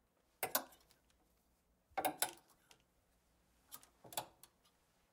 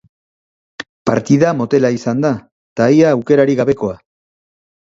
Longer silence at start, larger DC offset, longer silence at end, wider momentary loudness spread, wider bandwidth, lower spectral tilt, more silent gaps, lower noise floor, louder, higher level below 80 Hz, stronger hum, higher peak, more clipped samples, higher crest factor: second, 0.4 s vs 0.8 s; neither; second, 0.85 s vs 1 s; first, 19 LU vs 16 LU; first, 17.5 kHz vs 7.8 kHz; second, -1 dB/octave vs -7 dB/octave; second, none vs 0.89-1.05 s, 2.52-2.76 s; second, -78 dBFS vs under -90 dBFS; second, -42 LUFS vs -14 LUFS; second, -82 dBFS vs -52 dBFS; neither; second, -18 dBFS vs 0 dBFS; neither; first, 30 dB vs 16 dB